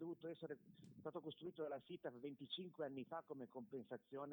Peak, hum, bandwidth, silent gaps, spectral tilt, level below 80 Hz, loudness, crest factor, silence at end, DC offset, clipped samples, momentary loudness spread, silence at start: -36 dBFS; none; over 20 kHz; none; -7 dB/octave; under -90 dBFS; -53 LUFS; 16 dB; 0 s; under 0.1%; under 0.1%; 5 LU; 0 s